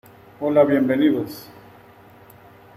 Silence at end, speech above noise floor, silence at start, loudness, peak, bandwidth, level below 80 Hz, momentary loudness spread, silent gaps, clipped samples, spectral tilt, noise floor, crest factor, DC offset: 1.35 s; 29 dB; 0.4 s; -19 LUFS; -4 dBFS; 15.5 kHz; -62 dBFS; 15 LU; none; under 0.1%; -7.5 dB/octave; -48 dBFS; 18 dB; under 0.1%